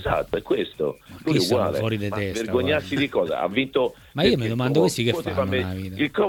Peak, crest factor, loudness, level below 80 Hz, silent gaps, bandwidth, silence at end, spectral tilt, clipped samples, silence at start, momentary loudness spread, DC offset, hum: -6 dBFS; 18 dB; -23 LUFS; -48 dBFS; none; 18.5 kHz; 0 s; -5.5 dB/octave; under 0.1%; 0 s; 7 LU; under 0.1%; none